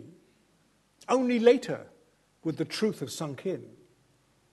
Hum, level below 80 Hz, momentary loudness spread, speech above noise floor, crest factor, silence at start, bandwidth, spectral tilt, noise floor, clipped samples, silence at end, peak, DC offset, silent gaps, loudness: none; -78 dBFS; 15 LU; 40 dB; 24 dB; 0 s; 12.5 kHz; -5.5 dB/octave; -67 dBFS; under 0.1%; 0.85 s; -6 dBFS; under 0.1%; none; -29 LUFS